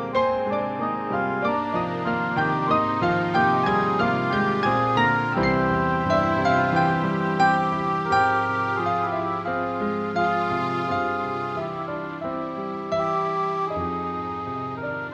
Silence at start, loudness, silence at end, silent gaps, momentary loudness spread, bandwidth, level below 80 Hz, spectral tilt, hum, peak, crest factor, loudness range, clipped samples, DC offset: 0 s; -23 LUFS; 0 s; none; 9 LU; 8.8 kHz; -50 dBFS; -7 dB/octave; none; -8 dBFS; 16 dB; 5 LU; under 0.1%; under 0.1%